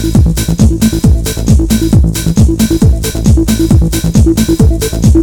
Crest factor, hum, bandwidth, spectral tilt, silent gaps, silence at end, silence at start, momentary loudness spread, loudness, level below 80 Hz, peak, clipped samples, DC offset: 8 dB; none; 19.5 kHz; -6.5 dB/octave; none; 0 s; 0 s; 2 LU; -10 LUFS; -12 dBFS; 0 dBFS; 0.3%; under 0.1%